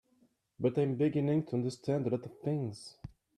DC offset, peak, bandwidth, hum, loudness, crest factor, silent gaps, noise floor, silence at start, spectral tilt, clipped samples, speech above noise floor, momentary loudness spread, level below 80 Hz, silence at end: under 0.1%; -18 dBFS; 11 kHz; none; -33 LUFS; 16 dB; none; -71 dBFS; 0.6 s; -8 dB/octave; under 0.1%; 39 dB; 13 LU; -68 dBFS; 0.3 s